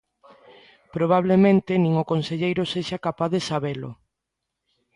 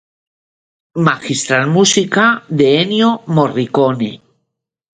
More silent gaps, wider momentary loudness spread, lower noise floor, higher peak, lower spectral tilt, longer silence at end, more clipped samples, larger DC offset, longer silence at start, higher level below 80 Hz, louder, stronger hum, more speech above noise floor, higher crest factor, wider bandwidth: neither; first, 13 LU vs 6 LU; first, -82 dBFS vs -73 dBFS; second, -6 dBFS vs 0 dBFS; first, -7 dB/octave vs -4.5 dB/octave; first, 1 s vs 0.8 s; neither; neither; about the same, 0.95 s vs 0.95 s; about the same, -58 dBFS vs -56 dBFS; second, -22 LUFS vs -13 LUFS; neither; about the same, 61 dB vs 60 dB; about the same, 18 dB vs 14 dB; first, 11 kHz vs 9.6 kHz